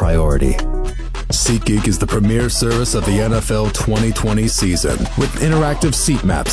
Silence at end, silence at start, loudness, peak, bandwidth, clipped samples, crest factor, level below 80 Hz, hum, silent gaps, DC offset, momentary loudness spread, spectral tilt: 0 s; 0 s; -16 LUFS; -2 dBFS; 11 kHz; under 0.1%; 12 dB; -20 dBFS; none; none; under 0.1%; 4 LU; -5 dB/octave